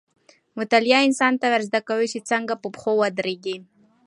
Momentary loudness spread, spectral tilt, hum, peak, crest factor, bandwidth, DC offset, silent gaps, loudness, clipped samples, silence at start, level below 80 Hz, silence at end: 14 LU; -3.5 dB/octave; none; -4 dBFS; 20 dB; 11.5 kHz; under 0.1%; none; -21 LUFS; under 0.1%; 0.55 s; -74 dBFS; 0.45 s